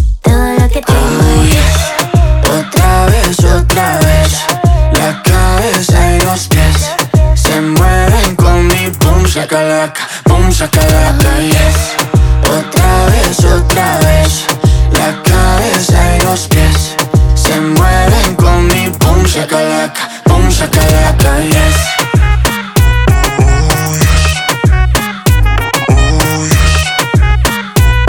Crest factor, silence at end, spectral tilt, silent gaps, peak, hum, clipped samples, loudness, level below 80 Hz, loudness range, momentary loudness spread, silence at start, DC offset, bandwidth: 8 dB; 0 s; -4.5 dB/octave; none; 0 dBFS; none; 0.2%; -9 LUFS; -12 dBFS; 1 LU; 3 LU; 0 s; under 0.1%; 19.5 kHz